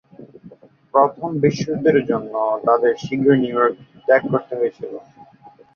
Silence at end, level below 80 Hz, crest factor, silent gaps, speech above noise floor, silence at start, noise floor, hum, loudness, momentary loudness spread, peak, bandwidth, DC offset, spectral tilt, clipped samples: 0.25 s; -58 dBFS; 18 dB; none; 29 dB; 0.2 s; -47 dBFS; none; -19 LUFS; 8 LU; -2 dBFS; 7 kHz; under 0.1%; -7 dB/octave; under 0.1%